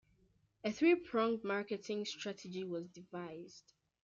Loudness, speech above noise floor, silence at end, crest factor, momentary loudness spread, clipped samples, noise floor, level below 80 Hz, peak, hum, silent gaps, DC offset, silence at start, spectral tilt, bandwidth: -38 LUFS; 36 dB; 0.45 s; 20 dB; 17 LU; under 0.1%; -74 dBFS; -80 dBFS; -20 dBFS; none; none; under 0.1%; 0.65 s; -5 dB/octave; 7.6 kHz